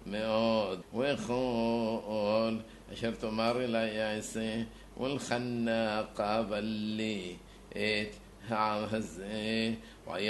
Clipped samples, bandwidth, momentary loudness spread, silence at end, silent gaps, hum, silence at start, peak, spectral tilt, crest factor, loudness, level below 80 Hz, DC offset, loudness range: under 0.1%; 12 kHz; 9 LU; 0 s; none; none; 0 s; -16 dBFS; -5 dB/octave; 18 dB; -33 LUFS; -58 dBFS; under 0.1%; 2 LU